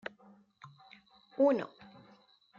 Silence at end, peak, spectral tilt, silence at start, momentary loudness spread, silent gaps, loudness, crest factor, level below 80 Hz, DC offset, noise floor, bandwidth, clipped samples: 0.9 s; -16 dBFS; -7.5 dB/octave; 0.65 s; 27 LU; none; -30 LUFS; 20 dB; -84 dBFS; under 0.1%; -64 dBFS; 7 kHz; under 0.1%